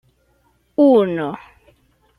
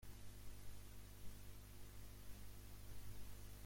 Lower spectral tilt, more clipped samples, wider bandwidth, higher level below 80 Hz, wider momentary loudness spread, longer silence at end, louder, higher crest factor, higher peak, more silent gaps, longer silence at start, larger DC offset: first, -8.5 dB/octave vs -4 dB/octave; neither; second, 10 kHz vs 16.5 kHz; about the same, -60 dBFS vs -60 dBFS; first, 15 LU vs 2 LU; first, 0.8 s vs 0 s; first, -17 LUFS vs -60 LUFS; about the same, 16 dB vs 12 dB; first, -4 dBFS vs -40 dBFS; neither; first, 0.8 s vs 0 s; neither